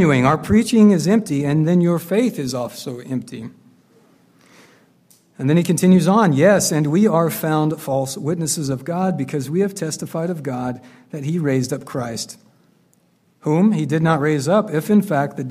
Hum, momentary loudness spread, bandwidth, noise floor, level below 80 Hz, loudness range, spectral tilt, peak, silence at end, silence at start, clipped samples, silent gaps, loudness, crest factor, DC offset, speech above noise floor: none; 14 LU; 15.5 kHz; -59 dBFS; -52 dBFS; 9 LU; -6 dB/octave; -2 dBFS; 0 s; 0 s; under 0.1%; none; -18 LUFS; 16 dB; under 0.1%; 42 dB